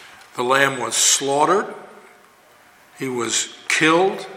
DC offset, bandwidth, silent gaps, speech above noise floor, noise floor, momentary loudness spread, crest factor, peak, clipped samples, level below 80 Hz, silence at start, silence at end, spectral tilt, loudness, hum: under 0.1%; 17 kHz; none; 32 dB; -51 dBFS; 16 LU; 20 dB; 0 dBFS; under 0.1%; -72 dBFS; 0 s; 0 s; -1.5 dB/octave; -18 LUFS; none